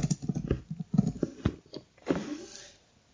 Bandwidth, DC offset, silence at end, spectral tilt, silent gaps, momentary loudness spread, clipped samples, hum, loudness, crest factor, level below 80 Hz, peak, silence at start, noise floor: 7.8 kHz; under 0.1%; 0.4 s; -6.5 dB/octave; none; 17 LU; under 0.1%; none; -33 LUFS; 22 dB; -46 dBFS; -10 dBFS; 0 s; -57 dBFS